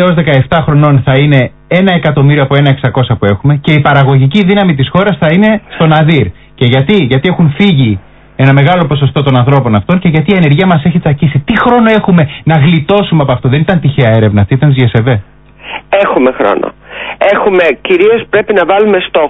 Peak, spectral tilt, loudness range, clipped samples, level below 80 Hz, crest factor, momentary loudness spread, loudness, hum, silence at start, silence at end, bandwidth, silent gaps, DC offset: 0 dBFS; -9.5 dB/octave; 2 LU; 0.4%; -34 dBFS; 8 dB; 4 LU; -8 LUFS; none; 0 s; 0 s; 4 kHz; none; under 0.1%